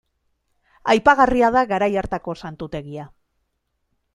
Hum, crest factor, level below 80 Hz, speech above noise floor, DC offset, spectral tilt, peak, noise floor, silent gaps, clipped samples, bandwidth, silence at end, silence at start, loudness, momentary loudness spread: none; 20 dB; -44 dBFS; 54 dB; under 0.1%; -5.5 dB/octave; -2 dBFS; -73 dBFS; none; under 0.1%; 12 kHz; 1.1 s; 0.85 s; -18 LUFS; 17 LU